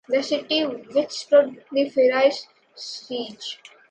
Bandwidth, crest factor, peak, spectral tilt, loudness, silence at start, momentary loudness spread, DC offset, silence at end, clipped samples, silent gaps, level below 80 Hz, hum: 8.8 kHz; 18 dB; -6 dBFS; -3 dB/octave; -22 LUFS; 0.1 s; 16 LU; under 0.1%; 0.35 s; under 0.1%; none; -76 dBFS; none